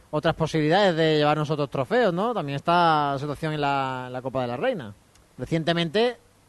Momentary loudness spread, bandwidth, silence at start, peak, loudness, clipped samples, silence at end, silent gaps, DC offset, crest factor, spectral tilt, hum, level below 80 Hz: 9 LU; 12 kHz; 0.1 s; -6 dBFS; -24 LUFS; under 0.1%; 0.35 s; none; under 0.1%; 18 dB; -6.5 dB/octave; none; -54 dBFS